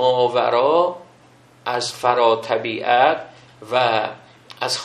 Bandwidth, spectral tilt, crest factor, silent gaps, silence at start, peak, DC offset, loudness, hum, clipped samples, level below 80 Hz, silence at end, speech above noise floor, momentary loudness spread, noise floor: 13 kHz; -3.5 dB/octave; 18 dB; none; 0 s; -2 dBFS; under 0.1%; -19 LUFS; none; under 0.1%; -68 dBFS; 0 s; 32 dB; 11 LU; -50 dBFS